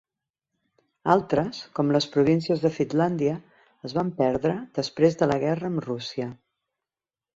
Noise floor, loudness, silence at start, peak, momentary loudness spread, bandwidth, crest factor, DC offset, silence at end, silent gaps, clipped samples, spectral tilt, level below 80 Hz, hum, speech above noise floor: under -90 dBFS; -25 LUFS; 1.05 s; -6 dBFS; 10 LU; 7.8 kHz; 20 dB; under 0.1%; 1.05 s; none; under 0.1%; -7 dB/octave; -60 dBFS; none; over 66 dB